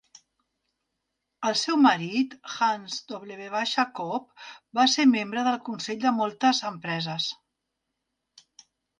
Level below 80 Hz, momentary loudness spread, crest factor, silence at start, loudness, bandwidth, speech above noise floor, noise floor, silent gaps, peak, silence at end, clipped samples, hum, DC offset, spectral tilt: -76 dBFS; 14 LU; 20 dB; 1.4 s; -25 LUFS; 9.6 kHz; 56 dB; -82 dBFS; none; -8 dBFS; 1.65 s; under 0.1%; none; under 0.1%; -3.5 dB/octave